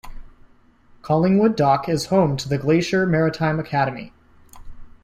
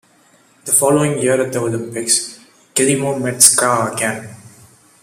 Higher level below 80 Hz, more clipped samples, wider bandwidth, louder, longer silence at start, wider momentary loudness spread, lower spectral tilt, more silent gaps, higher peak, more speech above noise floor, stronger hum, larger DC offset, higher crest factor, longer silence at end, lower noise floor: first, -44 dBFS vs -58 dBFS; neither; about the same, 14.5 kHz vs 15.5 kHz; second, -20 LUFS vs -14 LUFS; second, 0.05 s vs 0.65 s; second, 6 LU vs 13 LU; first, -6.5 dB/octave vs -3 dB/octave; neither; second, -6 dBFS vs 0 dBFS; second, 33 dB vs 37 dB; neither; neither; about the same, 16 dB vs 18 dB; second, 0.15 s vs 0.55 s; about the same, -52 dBFS vs -52 dBFS